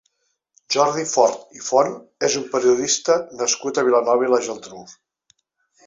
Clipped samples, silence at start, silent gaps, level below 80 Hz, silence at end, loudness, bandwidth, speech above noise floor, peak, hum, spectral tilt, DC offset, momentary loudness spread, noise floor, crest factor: under 0.1%; 0.7 s; none; -68 dBFS; 0.95 s; -19 LUFS; 7.8 kHz; 51 dB; -2 dBFS; none; -2.5 dB/octave; under 0.1%; 11 LU; -71 dBFS; 18 dB